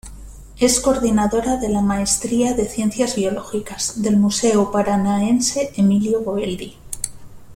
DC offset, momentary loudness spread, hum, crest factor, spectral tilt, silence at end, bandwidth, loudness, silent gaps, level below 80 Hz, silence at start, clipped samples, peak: under 0.1%; 11 LU; none; 16 dB; -4.5 dB/octave; 0 s; 16 kHz; -19 LUFS; none; -40 dBFS; 0.05 s; under 0.1%; -2 dBFS